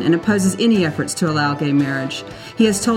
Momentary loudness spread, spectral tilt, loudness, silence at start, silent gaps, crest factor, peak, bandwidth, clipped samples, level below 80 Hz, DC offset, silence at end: 9 LU; -5 dB/octave; -18 LUFS; 0 s; none; 14 dB; -2 dBFS; 16 kHz; under 0.1%; -52 dBFS; under 0.1%; 0 s